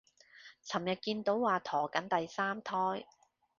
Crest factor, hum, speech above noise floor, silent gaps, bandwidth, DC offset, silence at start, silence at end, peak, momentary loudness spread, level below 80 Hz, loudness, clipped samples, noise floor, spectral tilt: 22 dB; none; 24 dB; none; 7.4 kHz; under 0.1%; 0.35 s; 0.55 s; -14 dBFS; 13 LU; -78 dBFS; -35 LUFS; under 0.1%; -59 dBFS; -3 dB/octave